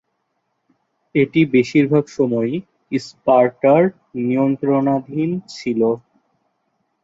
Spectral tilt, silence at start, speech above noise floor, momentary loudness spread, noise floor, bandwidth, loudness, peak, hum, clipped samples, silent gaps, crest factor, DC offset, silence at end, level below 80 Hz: -7.5 dB/octave; 1.15 s; 54 dB; 11 LU; -71 dBFS; 7.8 kHz; -18 LUFS; -2 dBFS; none; under 0.1%; none; 16 dB; under 0.1%; 1.05 s; -62 dBFS